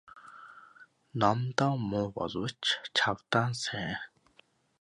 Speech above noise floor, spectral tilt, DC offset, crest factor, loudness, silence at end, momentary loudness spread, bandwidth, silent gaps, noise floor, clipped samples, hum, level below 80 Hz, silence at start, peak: 35 dB; -4.5 dB/octave; under 0.1%; 24 dB; -31 LUFS; 0.75 s; 22 LU; 11.5 kHz; none; -65 dBFS; under 0.1%; none; -64 dBFS; 0.15 s; -8 dBFS